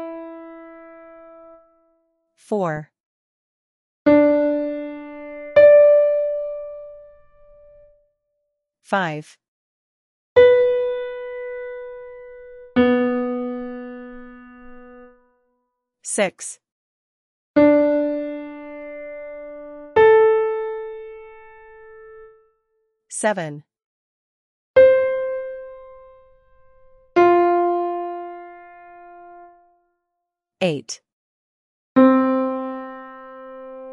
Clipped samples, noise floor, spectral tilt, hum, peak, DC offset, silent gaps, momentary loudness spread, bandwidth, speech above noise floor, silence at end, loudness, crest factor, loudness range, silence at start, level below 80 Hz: under 0.1%; -81 dBFS; -5 dB/octave; none; -2 dBFS; under 0.1%; 3.00-4.05 s, 9.48-10.36 s, 16.71-17.54 s, 23.84-24.74 s, 31.13-31.95 s; 24 LU; 11.5 kHz; 57 dB; 0 s; -18 LUFS; 20 dB; 13 LU; 0 s; -58 dBFS